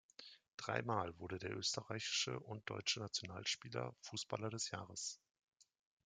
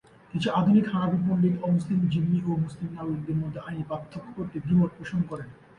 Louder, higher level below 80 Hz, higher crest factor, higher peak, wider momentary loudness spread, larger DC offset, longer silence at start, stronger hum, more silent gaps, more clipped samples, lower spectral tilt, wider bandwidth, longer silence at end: second, -43 LUFS vs -27 LUFS; second, -78 dBFS vs -56 dBFS; first, 24 dB vs 16 dB; second, -22 dBFS vs -10 dBFS; second, 8 LU vs 13 LU; neither; second, 0.2 s vs 0.35 s; neither; first, 0.54-0.58 s, 5.31-5.35 s, 5.48-5.52 s vs none; neither; second, -2.5 dB/octave vs -8.5 dB/octave; first, 11 kHz vs 9.6 kHz; first, 0.4 s vs 0.25 s